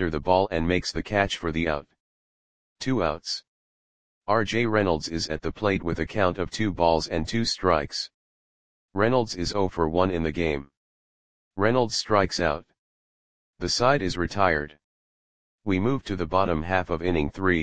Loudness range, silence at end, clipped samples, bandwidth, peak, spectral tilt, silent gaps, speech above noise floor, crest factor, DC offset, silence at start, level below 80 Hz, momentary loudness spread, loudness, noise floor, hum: 3 LU; 0 s; under 0.1%; 10 kHz; -4 dBFS; -5 dB/octave; 2.00-2.76 s, 3.48-4.22 s, 8.14-8.88 s, 10.77-11.51 s, 12.79-13.53 s, 14.84-15.58 s; over 65 dB; 22 dB; 0.9%; 0 s; -44 dBFS; 9 LU; -25 LUFS; under -90 dBFS; none